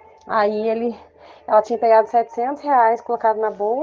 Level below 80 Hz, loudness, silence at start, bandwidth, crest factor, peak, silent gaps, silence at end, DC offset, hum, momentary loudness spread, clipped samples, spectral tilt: -68 dBFS; -19 LUFS; 0.25 s; 7.2 kHz; 14 dB; -4 dBFS; none; 0 s; under 0.1%; none; 9 LU; under 0.1%; -6 dB/octave